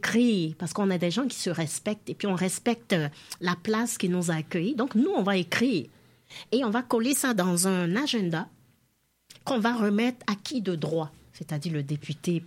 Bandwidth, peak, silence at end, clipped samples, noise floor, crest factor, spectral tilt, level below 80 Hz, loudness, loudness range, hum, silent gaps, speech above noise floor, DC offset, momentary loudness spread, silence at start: 16.5 kHz; -10 dBFS; 0 s; under 0.1%; -70 dBFS; 18 dB; -4.5 dB/octave; -70 dBFS; -27 LUFS; 3 LU; none; none; 43 dB; under 0.1%; 9 LU; 0 s